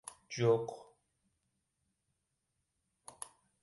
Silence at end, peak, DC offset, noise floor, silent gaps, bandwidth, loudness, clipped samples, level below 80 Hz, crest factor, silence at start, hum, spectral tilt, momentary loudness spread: 0.35 s; -18 dBFS; under 0.1%; -84 dBFS; none; 11.5 kHz; -34 LUFS; under 0.1%; -78 dBFS; 24 dB; 0.3 s; none; -5.5 dB/octave; 22 LU